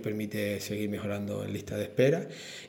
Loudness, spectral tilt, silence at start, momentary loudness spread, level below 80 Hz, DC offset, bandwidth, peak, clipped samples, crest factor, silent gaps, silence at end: -32 LUFS; -6 dB/octave; 0 s; 9 LU; -66 dBFS; under 0.1%; 17.5 kHz; -12 dBFS; under 0.1%; 20 dB; none; 0 s